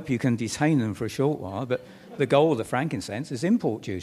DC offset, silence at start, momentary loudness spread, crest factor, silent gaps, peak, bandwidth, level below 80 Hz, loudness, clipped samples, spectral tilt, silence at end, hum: under 0.1%; 0 s; 10 LU; 18 dB; none; -6 dBFS; 14.5 kHz; -60 dBFS; -26 LUFS; under 0.1%; -6.5 dB/octave; 0 s; none